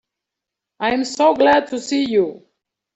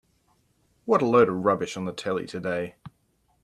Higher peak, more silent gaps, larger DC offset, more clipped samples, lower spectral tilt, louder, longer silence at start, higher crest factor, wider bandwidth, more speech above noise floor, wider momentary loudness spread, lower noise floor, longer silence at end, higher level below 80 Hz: first, -4 dBFS vs -8 dBFS; neither; neither; neither; second, -3.5 dB/octave vs -6 dB/octave; first, -18 LUFS vs -25 LUFS; about the same, 0.8 s vs 0.85 s; about the same, 16 dB vs 20 dB; second, 8.2 kHz vs 12 kHz; first, 67 dB vs 44 dB; second, 9 LU vs 12 LU; first, -84 dBFS vs -68 dBFS; about the same, 0.6 s vs 0.55 s; first, -58 dBFS vs -66 dBFS